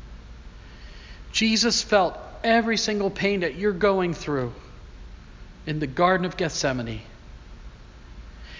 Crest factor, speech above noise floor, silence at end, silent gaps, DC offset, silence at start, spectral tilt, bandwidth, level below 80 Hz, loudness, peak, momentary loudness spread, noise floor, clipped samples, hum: 20 dB; 21 dB; 0 s; none; under 0.1%; 0 s; -4 dB/octave; 7.6 kHz; -44 dBFS; -23 LUFS; -6 dBFS; 24 LU; -44 dBFS; under 0.1%; none